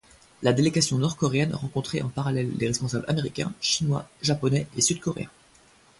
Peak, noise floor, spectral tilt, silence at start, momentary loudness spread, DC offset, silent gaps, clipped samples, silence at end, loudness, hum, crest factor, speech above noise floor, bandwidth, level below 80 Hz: -8 dBFS; -57 dBFS; -4.5 dB/octave; 0.4 s; 7 LU; under 0.1%; none; under 0.1%; 0.7 s; -25 LUFS; none; 18 dB; 31 dB; 11.5 kHz; -56 dBFS